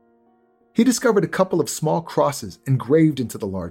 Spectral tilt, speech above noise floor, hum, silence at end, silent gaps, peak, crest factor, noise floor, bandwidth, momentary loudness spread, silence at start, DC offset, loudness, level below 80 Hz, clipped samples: -6 dB/octave; 40 dB; none; 0 s; none; -4 dBFS; 18 dB; -59 dBFS; 17 kHz; 10 LU; 0.75 s; under 0.1%; -20 LUFS; -58 dBFS; under 0.1%